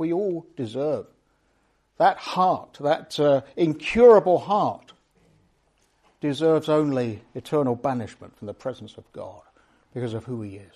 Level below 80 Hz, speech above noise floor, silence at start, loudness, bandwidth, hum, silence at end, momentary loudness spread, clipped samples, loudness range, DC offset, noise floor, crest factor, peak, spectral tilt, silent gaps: -58 dBFS; 44 dB; 0 s; -23 LUFS; 12 kHz; none; 0.15 s; 21 LU; under 0.1%; 10 LU; under 0.1%; -67 dBFS; 20 dB; -4 dBFS; -7 dB/octave; none